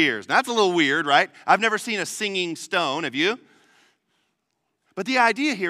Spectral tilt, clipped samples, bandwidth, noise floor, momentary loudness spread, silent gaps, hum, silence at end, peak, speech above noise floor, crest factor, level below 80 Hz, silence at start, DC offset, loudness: -3 dB/octave; under 0.1%; 15.5 kHz; -76 dBFS; 7 LU; none; none; 0 s; -2 dBFS; 54 dB; 20 dB; -78 dBFS; 0 s; under 0.1%; -21 LUFS